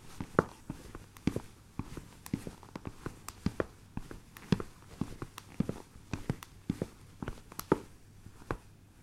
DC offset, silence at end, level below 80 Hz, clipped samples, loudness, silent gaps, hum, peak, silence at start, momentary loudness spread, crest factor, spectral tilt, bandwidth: under 0.1%; 0 s; -52 dBFS; under 0.1%; -40 LUFS; none; none; -6 dBFS; 0 s; 15 LU; 34 dB; -6.5 dB/octave; 16 kHz